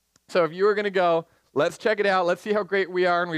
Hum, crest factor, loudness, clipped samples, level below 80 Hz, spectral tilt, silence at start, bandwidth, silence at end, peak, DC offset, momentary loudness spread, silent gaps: none; 14 dB; -23 LUFS; under 0.1%; -70 dBFS; -5.5 dB/octave; 0.3 s; 12.5 kHz; 0 s; -10 dBFS; under 0.1%; 4 LU; none